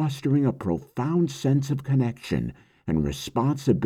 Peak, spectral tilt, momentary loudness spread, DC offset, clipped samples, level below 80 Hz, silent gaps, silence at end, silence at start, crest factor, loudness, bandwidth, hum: -8 dBFS; -7.5 dB/octave; 6 LU; under 0.1%; under 0.1%; -46 dBFS; none; 0 s; 0 s; 16 dB; -26 LUFS; 14 kHz; none